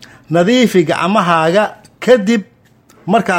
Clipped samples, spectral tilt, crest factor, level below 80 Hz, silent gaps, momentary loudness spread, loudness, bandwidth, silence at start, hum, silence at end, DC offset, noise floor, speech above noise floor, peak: under 0.1%; -5.5 dB/octave; 14 dB; -56 dBFS; none; 8 LU; -13 LUFS; 16.5 kHz; 0 s; none; 0 s; under 0.1%; -48 dBFS; 36 dB; 0 dBFS